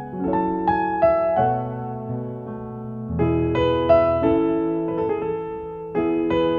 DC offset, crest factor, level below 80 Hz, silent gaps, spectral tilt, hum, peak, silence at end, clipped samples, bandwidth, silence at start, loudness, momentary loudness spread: under 0.1%; 18 dB; -42 dBFS; none; -9.5 dB/octave; none; -4 dBFS; 0 s; under 0.1%; 5 kHz; 0 s; -22 LUFS; 14 LU